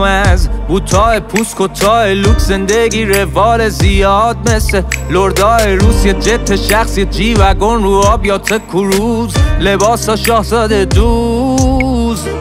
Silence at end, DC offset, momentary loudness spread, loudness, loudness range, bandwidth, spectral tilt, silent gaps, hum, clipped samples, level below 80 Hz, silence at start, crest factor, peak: 0 s; under 0.1%; 4 LU; -11 LUFS; 1 LU; 16.5 kHz; -5 dB/octave; none; none; under 0.1%; -16 dBFS; 0 s; 10 dB; 0 dBFS